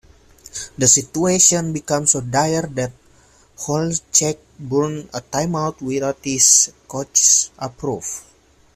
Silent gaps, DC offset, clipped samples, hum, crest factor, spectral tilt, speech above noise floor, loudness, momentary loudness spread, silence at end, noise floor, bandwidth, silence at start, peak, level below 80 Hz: none; under 0.1%; under 0.1%; none; 20 dB; -3 dB/octave; 33 dB; -16 LUFS; 17 LU; 0.55 s; -52 dBFS; 16 kHz; 0.55 s; 0 dBFS; -52 dBFS